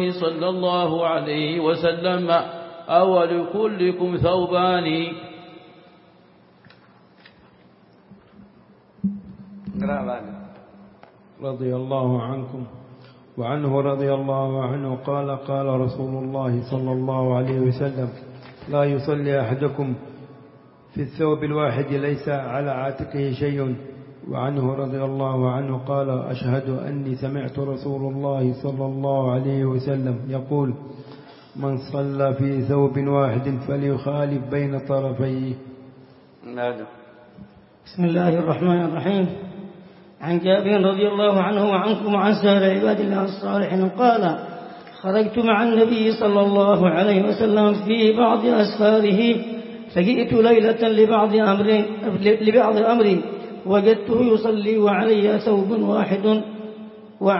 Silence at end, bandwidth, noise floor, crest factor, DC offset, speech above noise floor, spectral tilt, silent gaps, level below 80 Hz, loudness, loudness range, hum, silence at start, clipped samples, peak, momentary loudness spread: 0 s; 5.8 kHz; -53 dBFS; 18 dB; under 0.1%; 33 dB; -11.5 dB/octave; none; -58 dBFS; -21 LUFS; 10 LU; none; 0 s; under 0.1%; -2 dBFS; 14 LU